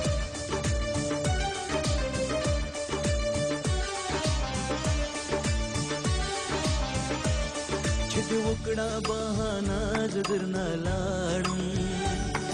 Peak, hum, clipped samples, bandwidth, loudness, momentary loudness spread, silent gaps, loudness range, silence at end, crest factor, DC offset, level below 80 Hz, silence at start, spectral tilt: -16 dBFS; none; under 0.1%; 10.5 kHz; -29 LUFS; 2 LU; none; 0 LU; 0 s; 12 dB; under 0.1%; -36 dBFS; 0 s; -4.5 dB/octave